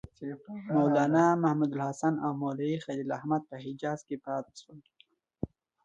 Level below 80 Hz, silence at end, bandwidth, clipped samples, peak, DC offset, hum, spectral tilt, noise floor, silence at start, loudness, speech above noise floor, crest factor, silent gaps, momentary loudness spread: -64 dBFS; 0.4 s; 9 kHz; under 0.1%; -12 dBFS; under 0.1%; none; -7.5 dB/octave; -66 dBFS; 0.2 s; -30 LUFS; 36 dB; 18 dB; none; 17 LU